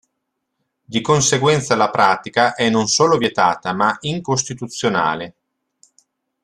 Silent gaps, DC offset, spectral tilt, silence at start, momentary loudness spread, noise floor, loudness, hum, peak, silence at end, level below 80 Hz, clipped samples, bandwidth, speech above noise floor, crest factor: none; under 0.1%; -3.5 dB/octave; 0.9 s; 9 LU; -75 dBFS; -17 LUFS; none; -2 dBFS; 1.15 s; -56 dBFS; under 0.1%; 12.5 kHz; 58 dB; 18 dB